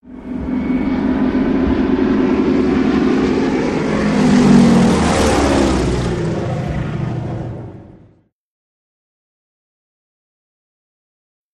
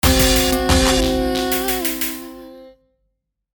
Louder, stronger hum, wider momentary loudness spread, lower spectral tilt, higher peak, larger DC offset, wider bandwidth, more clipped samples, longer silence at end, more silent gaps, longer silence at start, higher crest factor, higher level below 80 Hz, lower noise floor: about the same, -15 LUFS vs -17 LUFS; neither; second, 12 LU vs 15 LU; first, -6.5 dB/octave vs -3.5 dB/octave; about the same, -2 dBFS vs -2 dBFS; neither; second, 12 kHz vs 19.5 kHz; neither; first, 3.6 s vs 0.85 s; neither; about the same, 0.05 s vs 0.05 s; about the same, 16 dB vs 18 dB; about the same, -30 dBFS vs -26 dBFS; second, -51 dBFS vs -72 dBFS